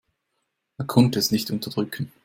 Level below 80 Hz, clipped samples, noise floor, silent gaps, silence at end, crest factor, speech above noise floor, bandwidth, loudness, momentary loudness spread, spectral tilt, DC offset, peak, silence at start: -58 dBFS; under 0.1%; -77 dBFS; none; 0.15 s; 20 dB; 54 dB; 16.5 kHz; -23 LUFS; 10 LU; -5.5 dB/octave; under 0.1%; -4 dBFS; 0.8 s